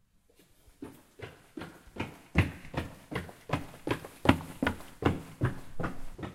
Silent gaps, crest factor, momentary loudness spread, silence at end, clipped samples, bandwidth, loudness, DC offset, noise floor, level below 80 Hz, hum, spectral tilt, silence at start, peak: none; 30 dB; 20 LU; 0 s; under 0.1%; 16 kHz; -34 LUFS; under 0.1%; -64 dBFS; -48 dBFS; none; -6.5 dB/octave; 0.7 s; -4 dBFS